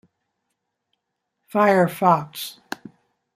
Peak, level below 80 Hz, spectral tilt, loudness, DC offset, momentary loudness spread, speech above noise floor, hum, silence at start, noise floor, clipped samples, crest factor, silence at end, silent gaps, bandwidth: -2 dBFS; -70 dBFS; -6 dB/octave; -19 LUFS; under 0.1%; 19 LU; 59 dB; none; 1.55 s; -78 dBFS; under 0.1%; 22 dB; 0.85 s; none; 15.5 kHz